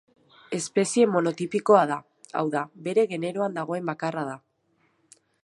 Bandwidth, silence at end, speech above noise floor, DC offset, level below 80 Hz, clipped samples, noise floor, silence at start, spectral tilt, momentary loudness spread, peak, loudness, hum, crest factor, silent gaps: 11.5 kHz; 1.05 s; 44 dB; under 0.1%; -76 dBFS; under 0.1%; -69 dBFS; 0.5 s; -5 dB/octave; 13 LU; -4 dBFS; -25 LUFS; none; 22 dB; none